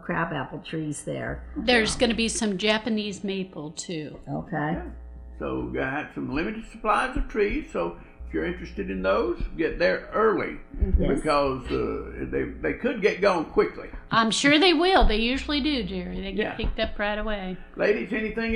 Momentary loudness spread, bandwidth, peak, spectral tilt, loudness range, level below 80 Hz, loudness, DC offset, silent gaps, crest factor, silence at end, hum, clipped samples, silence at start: 12 LU; 11.5 kHz; -6 dBFS; -4.5 dB/octave; 7 LU; -36 dBFS; -26 LUFS; under 0.1%; none; 18 dB; 0 s; none; under 0.1%; 0 s